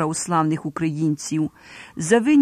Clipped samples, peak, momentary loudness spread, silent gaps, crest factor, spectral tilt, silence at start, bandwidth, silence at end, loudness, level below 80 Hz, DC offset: under 0.1%; -4 dBFS; 10 LU; none; 16 dB; -5.5 dB/octave; 0 s; 14 kHz; 0 s; -22 LUFS; -58 dBFS; under 0.1%